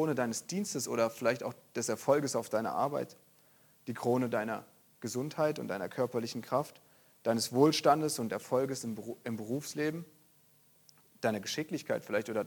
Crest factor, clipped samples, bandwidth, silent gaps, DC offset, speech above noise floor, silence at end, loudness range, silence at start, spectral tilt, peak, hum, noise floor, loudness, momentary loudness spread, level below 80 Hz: 22 dB; under 0.1%; 19 kHz; none; under 0.1%; 33 dB; 0 s; 6 LU; 0 s; -4.5 dB/octave; -12 dBFS; none; -66 dBFS; -33 LUFS; 12 LU; -78 dBFS